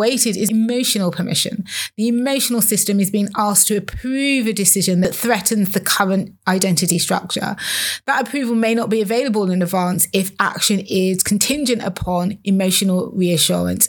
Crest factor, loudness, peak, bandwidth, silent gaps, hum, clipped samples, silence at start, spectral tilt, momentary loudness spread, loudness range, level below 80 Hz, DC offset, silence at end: 18 dB; -17 LUFS; 0 dBFS; over 20 kHz; none; none; under 0.1%; 0 s; -3.5 dB/octave; 6 LU; 2 LU; -48 dBFS; under 0.1%; 0 s